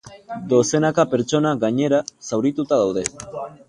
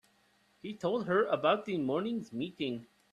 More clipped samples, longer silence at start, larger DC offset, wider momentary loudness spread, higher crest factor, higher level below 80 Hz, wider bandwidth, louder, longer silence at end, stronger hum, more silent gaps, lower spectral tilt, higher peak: neither; second, 0.05 s vs 0.65 s; neither; about the same, 13 LU vs 13 LU; about the same, 20 dB vs 18 dB; first, -56 dBFS vs -76 dBFS; about the same, 11.5 kHz vs 12.5 kHz; first, -20 LUFS vs -33 LUFS; second, 0.15 s vs 0.3 s; neither; neither; about the same, -5.5 dB/octave vs -6.5 dB/octave; first, 0 dBFS vs -14 dBFS